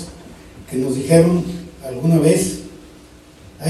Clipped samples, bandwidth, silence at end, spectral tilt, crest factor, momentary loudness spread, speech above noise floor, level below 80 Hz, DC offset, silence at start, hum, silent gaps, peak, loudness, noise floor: under 0.1%; 13.5 kHz; 0 s; -6.5 dB/octave; 18 dB; 18 LU; 28 dB; -44 dBFS; under 0.1%; 0 s; none; none; 0 dBFS; -17 LUFS; -43 dBFS